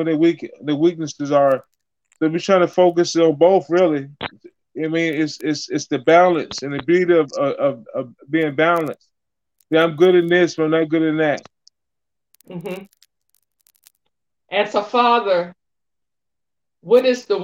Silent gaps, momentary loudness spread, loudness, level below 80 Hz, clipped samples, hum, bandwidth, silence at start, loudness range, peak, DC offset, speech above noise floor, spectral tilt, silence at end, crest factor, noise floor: none; 15 LU; -18 LUFS; -68 dBFS; under 0.1%; none; 8 kHz; 0 s; 7 LU; -2 dBFS; under 0.1%; 69 dB; -5.5 dB/octave; 0 s; 16 dB; -86 dBFS